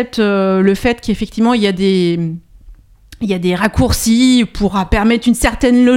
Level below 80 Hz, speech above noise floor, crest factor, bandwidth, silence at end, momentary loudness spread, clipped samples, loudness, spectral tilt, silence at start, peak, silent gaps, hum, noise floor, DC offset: -28 dBFS; 27 dB; 14 dB; 16.5 kHz; 0 s; 8 LU; under 0.1%; -14 LUFS; -5.5 dB/octave; 0 s; 0 dBFS; none; none; -40 dBFS; under 0.1%